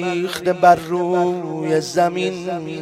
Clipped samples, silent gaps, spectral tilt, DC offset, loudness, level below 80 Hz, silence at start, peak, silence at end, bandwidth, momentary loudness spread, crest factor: under 0.1%; none; -5.5 dB/octave; under 0.1%; -19 LUFS; -58 dBFS; 0 s; 0 dBFS; 0 s; 15 kHz; 10 LU; 18 dB